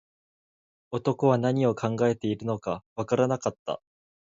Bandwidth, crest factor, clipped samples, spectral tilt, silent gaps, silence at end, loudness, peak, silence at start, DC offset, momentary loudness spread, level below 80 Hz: 7.8 kHz; 18 dB; under 0.1%; -7 dB/octave; 2.86-2.96 s, 3.59-3.66 s; 0.6 s; -27 LUFS; -10 dBFS; 0.9 s; under 0.1%; 12 LU; -64 dBFS